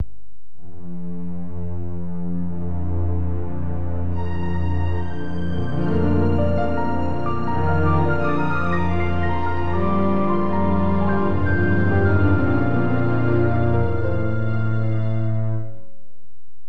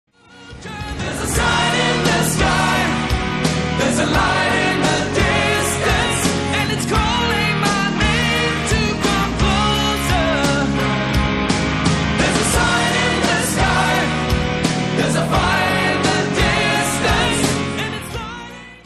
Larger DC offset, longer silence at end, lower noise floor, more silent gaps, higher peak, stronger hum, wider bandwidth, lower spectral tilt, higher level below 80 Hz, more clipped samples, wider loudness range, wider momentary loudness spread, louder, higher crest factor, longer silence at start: first, 9% vs under 0.1%; first, 0.85 s vs 0.05 s; first, -60 dBFS vs -40 dBFS; neither; second, -6 dBFS vs -2 dBFS; neither; second, 5.2 kHz vs 13 kHz; first, -10 dB/octave vs -4 dB/octave; second, -36 dBFS vs -30 dBFS; neither; first, 7 LU vs 1 LU; first, 11 LU vs 4 LU; second, -22 LUFS vs -17 LUFS; about the same, 14 dB vs 14 dB; second, 0 s vs 0.35 s